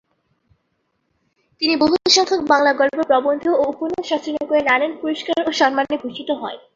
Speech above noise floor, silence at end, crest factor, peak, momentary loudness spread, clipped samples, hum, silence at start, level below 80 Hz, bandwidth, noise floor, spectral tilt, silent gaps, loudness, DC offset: 52 dB; 0.15 s; 18 dB; -2 dBFS; 10 LU; under 0.1%; none; 1.6 s; -60 dBFS; 7.8 kHz; -70 dBFS; -2 dB/octave; none; -18 LUFS; under 0.1%